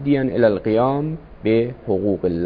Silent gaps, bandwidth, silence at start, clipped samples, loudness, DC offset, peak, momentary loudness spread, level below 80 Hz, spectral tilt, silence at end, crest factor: none; 5 kHz; 0 s; under 0.1%; -20 LUFS; under 0.1%; -4 dBFS; 7 LU; -44 dBFS; -11 dB/octave; 0 s; 16 dB